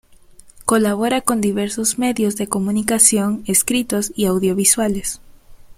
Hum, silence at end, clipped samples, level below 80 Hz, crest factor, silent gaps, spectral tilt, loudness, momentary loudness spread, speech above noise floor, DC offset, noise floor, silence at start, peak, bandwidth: none; 0.05 s; under 0.1%; -46 dBFS; 18 dB; none; -3.5 dB/octave; -17 LUFS; 9 LU; 27 dB; under 0.1%; -45 dBFS; 0.6 s; 0 dBFS; 16.5 kHz